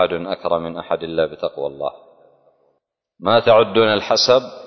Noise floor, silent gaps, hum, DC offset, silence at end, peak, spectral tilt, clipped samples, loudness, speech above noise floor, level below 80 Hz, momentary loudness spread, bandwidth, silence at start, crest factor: -70 dBFS; none; none; under 0.1%; 0 s; -2 dBFS; -4 dB/octave; under 0.1%; -18 LUFS; 52 dB; -54 dBFS; 12 LU; 6.4 kHz; 0 s; 18 dB